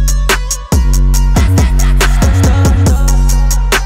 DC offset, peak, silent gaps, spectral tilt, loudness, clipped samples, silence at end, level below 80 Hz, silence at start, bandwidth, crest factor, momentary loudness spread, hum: under 0.1%; 0 dBFS; none; -4.5 dB/octave; -11 LUFS; under 0.1%; 0 s; -10 dBFS; 0 s; 16.5 kHz; 8 dB; 3 LU; none